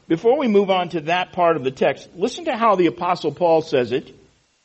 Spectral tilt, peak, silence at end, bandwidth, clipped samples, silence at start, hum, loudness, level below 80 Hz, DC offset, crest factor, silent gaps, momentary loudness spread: -6 dB/octave; -4 dBFS; 0.55 s; 8.2 kHz; under 0.1%; 0.1 s; none; -20 LUFS; -60 dBFS; under 0.1%; 16 dB; none; 7 LU